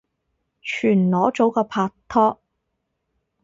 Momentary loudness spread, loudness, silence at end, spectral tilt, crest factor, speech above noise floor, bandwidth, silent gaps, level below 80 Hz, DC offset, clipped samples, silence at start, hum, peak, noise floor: 7 LU; -20 LUFS; 1.1 s; -7.5 dB/octave; 20 dB; 57 dB; 7.6 kHz; none; -60 dBFS; under 0.1%; under 0.1%; 0.65 s; none; -4 dBFS; -76 dBFS